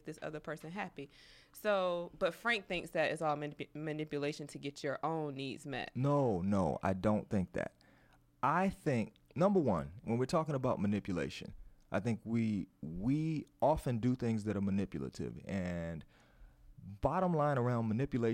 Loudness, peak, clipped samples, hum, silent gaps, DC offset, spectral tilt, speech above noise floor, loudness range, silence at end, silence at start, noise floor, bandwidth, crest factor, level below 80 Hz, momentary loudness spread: -36 LUFS; -18 dBFS; under 0.1%; none; none; under 0.1%; -7 dB/octave; 31 dB; 3 LU; 0 s; 0.05 s; -67 dBFS; 16 kHz; 18 dB; -58 dBFS; 11 LU